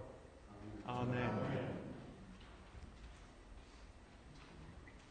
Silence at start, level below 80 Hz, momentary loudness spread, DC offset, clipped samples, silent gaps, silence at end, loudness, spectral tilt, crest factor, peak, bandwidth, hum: 0 s; -60 dBFS; 20 LU; under 0.1%; under 0.1%; none; 0 s; -45 LUFS; -7 dB/octave; 22 dB; -26 dBFS; 9.4 kHz; none